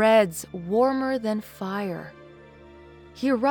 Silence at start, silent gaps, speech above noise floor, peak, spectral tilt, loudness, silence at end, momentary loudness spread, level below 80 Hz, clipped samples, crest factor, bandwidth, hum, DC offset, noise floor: 0 s; none; 24 dB; -10 dBFS; -5.5 dB/octave; -25 LUFS; 0 s; 15 LU; -60 dBFS; under 0.1%; 16 dB; over 20 kHz; none; under 0.1%; -48 dBFS